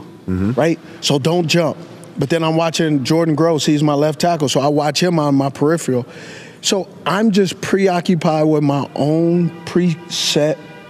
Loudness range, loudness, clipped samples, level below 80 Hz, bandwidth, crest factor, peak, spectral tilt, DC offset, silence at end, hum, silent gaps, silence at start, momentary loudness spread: 2 LU; -16 LUFS; under 0.1%; -56 dBFS; 15 kHz; 12 dB; -4 dBFS; -5.5 dB/octave; under 0.1%; 0 s; none; none; 0 s; 6 LU